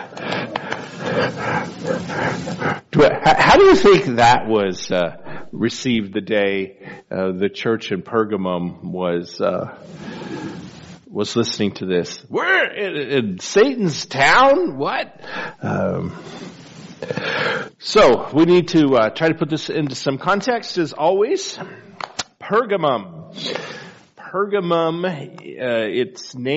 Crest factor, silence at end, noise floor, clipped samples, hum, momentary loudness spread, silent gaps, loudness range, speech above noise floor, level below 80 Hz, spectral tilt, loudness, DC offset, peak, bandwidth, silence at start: 16 dB; 0 s; -40 dBFS; under 0.1%; none; 18 LU; none; 9 LU; 22 dB; -48 dBFS; -3.5 dB/octave; -18 LUFS; under 0.1%; -2 dBFS; 8 kHz; 0 s